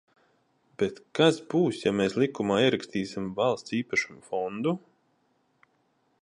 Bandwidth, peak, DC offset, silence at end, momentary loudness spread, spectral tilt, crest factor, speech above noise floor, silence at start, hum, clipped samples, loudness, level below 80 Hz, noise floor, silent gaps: 11 kHz; -8 dBFS; under 0.1%; 1.45 s; 9 LU; -5.5 dB/octave; 22 dB; 44 dB; 0.8 s; none; under 0.1%; -27 LUFS; -66 dBFS; -71 dBFS; none